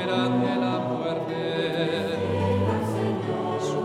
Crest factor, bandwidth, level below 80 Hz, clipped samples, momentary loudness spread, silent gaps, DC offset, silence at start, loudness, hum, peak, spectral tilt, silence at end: 14 dB; 14 kHz; -66 dBFS; under 0.1%; 4 LU; none; under 0.1%; 0 s; -26 LUFS; none; -10 dBFS; -6.5 dB/octave; 0 s